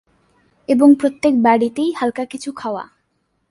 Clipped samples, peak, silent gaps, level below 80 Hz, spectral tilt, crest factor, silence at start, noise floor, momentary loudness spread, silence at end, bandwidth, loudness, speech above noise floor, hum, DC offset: under 0.1%; -2 dBFS; none; -60 dBFS; -5.5 dB/octave; 16 dB; 0.7 s; -67 dBFS; 14 LU; 0.65 s; 11.5 kHz; -16 LUFS; 52 dB; none; under 0.1%